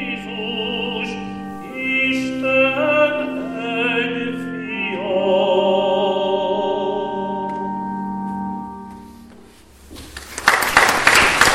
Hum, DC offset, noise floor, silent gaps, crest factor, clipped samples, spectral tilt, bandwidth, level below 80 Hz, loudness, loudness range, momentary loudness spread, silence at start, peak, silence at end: none; under 0.1%; -45 dBFS; none; 20 dB; under 0.1%; -3 dB/octave; 16.5 kHz; -46 dBFS; -18 LUFS; 7 LU; 16 LU; 0 s; 0 dBFS; 0 s